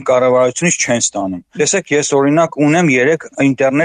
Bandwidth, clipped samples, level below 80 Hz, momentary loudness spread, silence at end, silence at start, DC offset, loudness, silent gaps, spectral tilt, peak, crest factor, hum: 10.5 kHz; under 0.1%; -58 dBFS; 5 LU; 0 s; 0 s; under 0.1%; -13 LUFS; none; -4 dB/octave; -2 dBFS; 10 dB; none